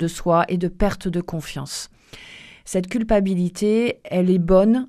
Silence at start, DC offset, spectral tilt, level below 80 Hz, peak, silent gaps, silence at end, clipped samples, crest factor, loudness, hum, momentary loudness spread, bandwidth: 0 s; under 0.1%; -6.5 dB/octave; -36 dBFS; -4 dBFS; none; 0 s; under 0.1%; 16 dB; -21 LUFS; none; 19 LU; 14.5 kHz